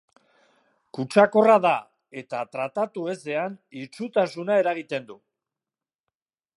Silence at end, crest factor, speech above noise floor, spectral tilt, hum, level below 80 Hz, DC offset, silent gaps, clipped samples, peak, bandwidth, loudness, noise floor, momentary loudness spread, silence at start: 1.4 s; 22 dB; over 67 dB; -6 dB/octave; none; -78 dBFS; under 0.1%; none; under 0.1%; -4 dBFS; 11.5 kHz; -23 LUFS; under -90 dBFS; 20 LU; 0.95 s